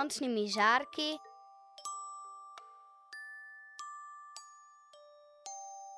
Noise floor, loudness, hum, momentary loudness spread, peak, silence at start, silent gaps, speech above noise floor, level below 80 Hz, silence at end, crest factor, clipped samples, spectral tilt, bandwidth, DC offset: -59 dBFS; -35 LUFS; none; 25 LU; -14 dBFS; 0 s; none; 27 dB; -90 dBFS; 0 s; 24 dB; under 0.1%; -2 dB/octave; 11 kHz; under 0.1%